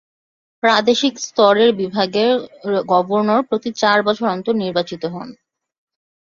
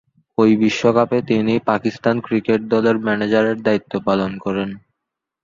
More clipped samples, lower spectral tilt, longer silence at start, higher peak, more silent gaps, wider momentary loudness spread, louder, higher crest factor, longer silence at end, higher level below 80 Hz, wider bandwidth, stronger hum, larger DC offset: neither; second, -4.5 dB/octave vs -6.5 dB/octave; first, 0.65 s vs 0.4 s; about the same, -2 dBFS vs -2 dBFS; neither; about the same, 9 LU vs 8 LU; about the same, -17 LUFS vs -18 LUFS; about the same, 16 dB vs 16 dB; first, 0.9 s vs 0.65 s; second, -62 dBFS vs -54 dBFS; about the same, 7.4 kHz vs 7.4 kHz; neither; neither